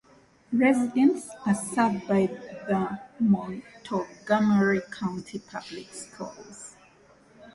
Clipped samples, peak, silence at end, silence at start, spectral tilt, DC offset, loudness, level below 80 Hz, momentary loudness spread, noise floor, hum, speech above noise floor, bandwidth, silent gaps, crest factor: under 0.1%; -10 dBFS; 0.05 s; 0.5 s; -6 dB/octave; under 0.1%; -26 LUFS; -64 dBFS; 18 LU; -57 dBFS; none; 31 dB; 11.5 kHz; none; 18 dB